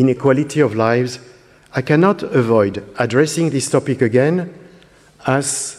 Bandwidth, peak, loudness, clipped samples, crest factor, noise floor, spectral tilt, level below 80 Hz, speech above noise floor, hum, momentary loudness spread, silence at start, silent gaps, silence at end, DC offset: 14.5 kHz; 0 dBFS; -17 LUFS; under 0.1%; 16 dB; -47 dBFS; -5.5 dB/octave; -56 dBFS; 31 dB; none; 10 LU; 0 s; none; 0 s; under 0.1%